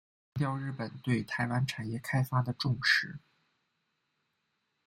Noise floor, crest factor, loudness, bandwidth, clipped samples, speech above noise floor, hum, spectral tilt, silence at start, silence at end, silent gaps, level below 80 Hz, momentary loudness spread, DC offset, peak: -80 dBFS; 22 dB; -32 LUFS; 16 kHz; under 0.1%; 48 dB; none; -5.5 dB/octave; 0.35 s; 1.7 s; none; -66 dBFS; 11 LU; under 0.1%; -12 dBFS